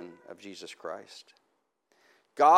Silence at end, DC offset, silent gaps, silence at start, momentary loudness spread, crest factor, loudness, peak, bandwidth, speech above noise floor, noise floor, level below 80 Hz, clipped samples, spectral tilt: 0 s; under 0.1%; none; 0.05 s; 14 LU; 24 dB; -34 LUFS; -6 dBFS; 12.5 kHz; 33 dB; -76 dBFS; under -90 dBFS; under 0.1%; -3.5 dB/octave